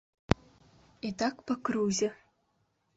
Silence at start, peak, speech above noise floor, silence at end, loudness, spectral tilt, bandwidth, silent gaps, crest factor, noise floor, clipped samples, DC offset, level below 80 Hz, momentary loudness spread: 0.3 s; -4 dBFS; 44 dB; 0.85 s; -33 LUFS; -5 dB/octave; 8.2 kHz; none; 30 dB; -75 dBFS; under 0.1%; under 0.1%; -50 dBFS; 6 LU